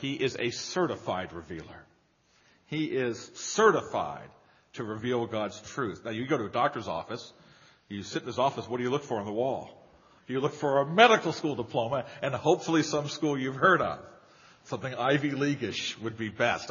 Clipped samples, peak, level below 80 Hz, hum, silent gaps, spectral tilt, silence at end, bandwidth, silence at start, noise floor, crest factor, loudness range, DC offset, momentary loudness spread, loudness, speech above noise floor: under 0.1%; -4 dBFS; -66 dBFS; none; none; -3.5 dB/octave; 0 s; 7.2 kHz; 0 s; -67 dBFS; 24 dB; 7 LU; under 0.1%; 16 LU; -29 LUFS; 38 dB